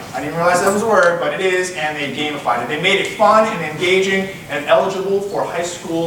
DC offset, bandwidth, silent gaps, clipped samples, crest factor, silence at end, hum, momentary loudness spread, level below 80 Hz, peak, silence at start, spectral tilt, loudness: under 0.1%; 18.5 kHz; none; under 0.1%; 16 dB; 0 s; none; 8 LU; -54 dBFS; 0 dBFS; 0 s; -4 dB/octave; -16 LUFS